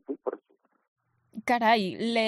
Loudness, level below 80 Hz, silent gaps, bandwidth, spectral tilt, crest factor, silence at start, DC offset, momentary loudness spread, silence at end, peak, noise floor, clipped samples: -27 LUFS; -74 dBFS; 0.88-0.96 s; 13 kHz; -5 dB/octave; 18 dB; 0.1 s; under 0.1%; 21 LU; 0 s; -12 dBFS; -68 dBFS; under 0.1%